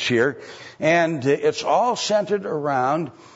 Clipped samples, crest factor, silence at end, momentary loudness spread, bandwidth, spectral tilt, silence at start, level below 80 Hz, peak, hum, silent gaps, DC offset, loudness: under 0.1%; 16 dB; 0.25 s; 6 LU; 8 kHz; -4.5 dB/octave; 0 s; -68 dBFS; -6 dBFS; none; none; under 0.1%; -21 LUFS